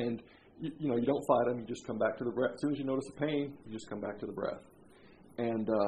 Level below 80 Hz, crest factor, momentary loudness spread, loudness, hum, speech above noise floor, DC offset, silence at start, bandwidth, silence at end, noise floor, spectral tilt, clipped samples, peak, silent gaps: -70 dBFS; 22 dB; 14 LU; -35 LUFS; none; 24 dB; under 0.1%; 0 s; 12.5 kHz; 0 s; -58 dBFS; -7 dB/octave; under 0.1%; -14 dBFS; none